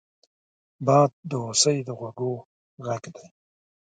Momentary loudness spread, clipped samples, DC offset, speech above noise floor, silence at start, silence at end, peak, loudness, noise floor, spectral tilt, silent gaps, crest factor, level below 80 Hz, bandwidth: 16 LU; under 0.1%; under 0.1%; over 66 dB; 0.8 s; 0.7 s; -6 dBFS; -24 LUFS; under -90 dBFS; -4 dB/octave; 1.13-1.23 s, 2.45-2.77 s; 22 dB; -72 dBFS; 9.4 kHz